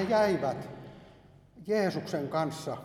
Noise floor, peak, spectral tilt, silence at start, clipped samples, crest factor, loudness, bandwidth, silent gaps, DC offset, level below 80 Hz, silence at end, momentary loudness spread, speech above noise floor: -56 dBFS; -14 dBFS; -6 dB/octave; 0 s; under 0.1%; 18 dB; -31 LUFS; 15 kHz; none; under 0.1%; -66 dBFS; 0 s; 21 LU; 26 dB